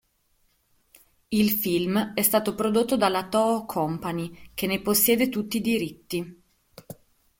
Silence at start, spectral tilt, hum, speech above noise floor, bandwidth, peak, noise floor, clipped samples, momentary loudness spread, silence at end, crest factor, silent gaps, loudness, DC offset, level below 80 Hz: 1.3 s; -4 dB/octave; none; 43 dB; 17 kHz; -8 dBFS; -68 dBFS; under 0.1%; 12 LU; 0.45 s; 18 dB; none; -24 LUFS; under 0.1%; -58 dBFS